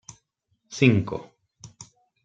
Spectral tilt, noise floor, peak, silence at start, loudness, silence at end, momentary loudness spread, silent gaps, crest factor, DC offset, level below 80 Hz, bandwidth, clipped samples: -6 dB/octave; -73 dBFS; -4 dBFS; 0.7 s; -22 LUFS; 0.4 s; 25 LU; none; 24 dB; under 0.1%; -60 dBFS; 8.6 kHz; under 0.1%